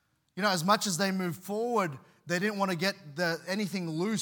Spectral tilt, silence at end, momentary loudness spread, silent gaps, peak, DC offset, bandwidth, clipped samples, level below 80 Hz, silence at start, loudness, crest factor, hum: -4 dB/octave; 0 s; 8 LU; none; -10 dBFS; under 0.1%; 18 kHz; under 0.1%; -82 dBFS; 0.35 s; -30 LUFS; 20 dB; none